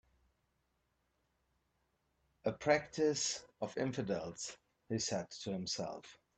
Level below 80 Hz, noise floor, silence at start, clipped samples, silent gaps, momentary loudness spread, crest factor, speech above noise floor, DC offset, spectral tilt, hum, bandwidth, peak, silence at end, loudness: -72 dBFS; -81 dBFS; 2.45 s; under 0.1%; none; 11 LU; 22 dB; 43 dB; under 0.1%; -3.5 dB/octave; none; 9 kHz; -18 dBFS; 0.25 s; -38 LUFS